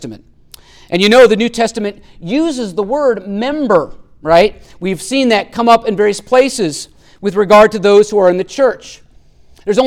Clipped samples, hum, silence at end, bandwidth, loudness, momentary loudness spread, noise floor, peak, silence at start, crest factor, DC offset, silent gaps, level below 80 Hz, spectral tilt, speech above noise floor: under 0.1%; none; 0 s; 15.5 kHz; -12 LUFS; 16 LU; -43 dBFS; 0 dBFS; 0 s; 12 dB; under 0.1%; none; -42 dBFS; -4.5 dB/octave; 31 dB